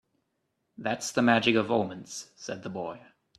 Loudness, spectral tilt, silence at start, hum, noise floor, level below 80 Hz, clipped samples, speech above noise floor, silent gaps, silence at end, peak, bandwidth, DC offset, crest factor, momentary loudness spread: -28 LUFS; -4 dB/octave; 0.8 s; none; -78 dBFS; -70 dBFS; under 0.1%; 50 dB; none; 0.4 s; -6 dBFS; 13 kHz; under 0.1%; 24 dB; 17 LU